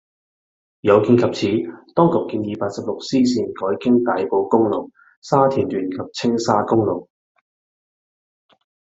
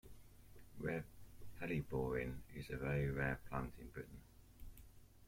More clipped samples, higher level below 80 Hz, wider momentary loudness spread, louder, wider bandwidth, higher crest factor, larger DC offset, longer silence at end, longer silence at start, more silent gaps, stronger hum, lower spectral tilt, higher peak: neither; about the same, -60 dBFS vs -58 dBFS; second, 9 LU vs 23 LU; first, -19 LUFS vs -44 LUFS; second, 8 kHz vs 16.5 kHz; about the same, 18 dB vs 18 dB; neither; first, 1.9 s vs 0 s; first, 0.85 s vs 0.05 s; first, 5.17-5.22 s vs none; neither; about the same, -6.5 dB/octave vs -7.5 dB/octave; first, -2 dBFS vs -28 dBFS